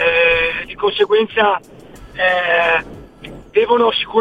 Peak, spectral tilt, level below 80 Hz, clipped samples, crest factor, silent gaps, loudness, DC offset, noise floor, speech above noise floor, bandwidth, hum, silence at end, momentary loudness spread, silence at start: -2 dBFS; -4.5 dB/octave; -44 dBFS; under 0.1%; 14 dB; none; -15 LUFS; 0.2%; -36 dBFS; 21 dB; 9 kHz; none; 0 s; 21 LU; 0 s